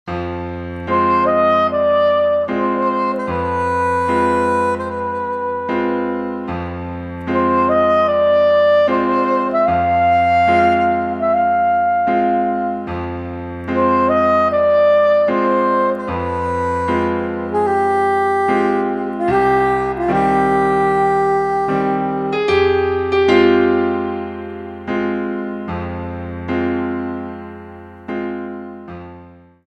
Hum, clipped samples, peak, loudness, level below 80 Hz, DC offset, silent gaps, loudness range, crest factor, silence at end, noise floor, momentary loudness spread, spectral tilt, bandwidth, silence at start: none; under 0.1%; -2 dBFS; -16 LUFS; -44 dBFS; under 0.1%; none; 8 LU; 16 dB; 0.35 s; -42 dBFS; 13 LU; -7 dB/octave; 10 kHz; 0.05 s